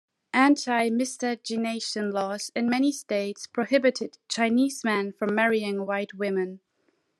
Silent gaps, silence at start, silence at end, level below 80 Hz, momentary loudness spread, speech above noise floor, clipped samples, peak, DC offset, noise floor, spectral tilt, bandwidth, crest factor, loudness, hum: none; 0.35 s; 0.6 s; -80 dBFS; 8 LU; 46 dB; under 0.1%; -8 dBFS; under 0.1%; -71 dBFS; -4 dB/octave; 13 kHz; 18 dB; -26 LUFS; none